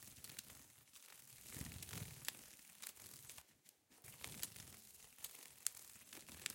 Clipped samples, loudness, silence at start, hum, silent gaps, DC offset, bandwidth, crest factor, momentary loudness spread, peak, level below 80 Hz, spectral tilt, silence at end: under 0.1%; -52 LUFS; 0 s; none; none; under 0.1%; 17 kHz; 40 dB; 15 LU; -14 dBFS; -74 dBFS; -1.5 dB/octave; 0 s